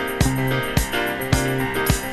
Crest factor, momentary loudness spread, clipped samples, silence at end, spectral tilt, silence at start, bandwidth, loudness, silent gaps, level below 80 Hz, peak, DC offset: 18 dB; 2 LU; under 0.1%; 0 s; -4.5 dB/octave; 0 s; 15.5 kHz; -21 LUFS; none; -30 dBFS; -2 dBFS; under 0.1%